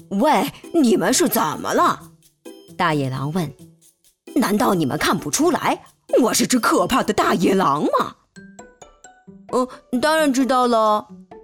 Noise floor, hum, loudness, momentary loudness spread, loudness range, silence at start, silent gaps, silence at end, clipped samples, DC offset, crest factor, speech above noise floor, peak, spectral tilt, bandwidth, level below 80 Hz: -57 dBFS; none; -19 LUFS; 8 LU; 4 LU; 0.1 s; none; 0.05 s; under 0.1%; under 0.1%; 14 dB; 38 dB; -6 dBFS; -4 dB/octave; 18.5 kHz; -54 dBFS